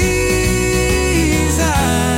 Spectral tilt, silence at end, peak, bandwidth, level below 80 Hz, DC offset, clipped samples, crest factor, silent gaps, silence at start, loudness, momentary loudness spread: -4.5 dB/octave; 0 s; -4 dBFS; 16.5 kHz; -22 dBFS; under 0.1%; under 0.1%; 10 dB; none; 0 s; -15 LUFS; 1 LU